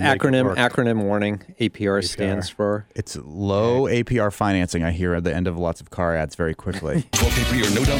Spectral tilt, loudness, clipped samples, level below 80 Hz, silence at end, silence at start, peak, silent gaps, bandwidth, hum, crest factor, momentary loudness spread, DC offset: -5 dB/octave; -22 LUFS; under 0.1%; -36 dBFS; 0 s; 0 s; -4 dBFS; none; 17.5 kHz; none; 18 dB; 7 LU; under 0.1%